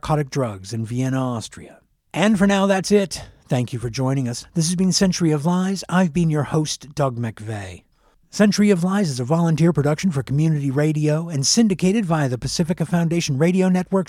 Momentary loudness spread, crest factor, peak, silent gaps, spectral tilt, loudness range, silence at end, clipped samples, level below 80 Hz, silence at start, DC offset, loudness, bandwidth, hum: 10 LU; 16 dB; -4 dBFS; none; -5.5 dB/octave; 2 LU; 0.05 s; under 0.1%; -48 dBFS; 0.05 s; under 0.1%; -20 LUFS; 14 kHz; none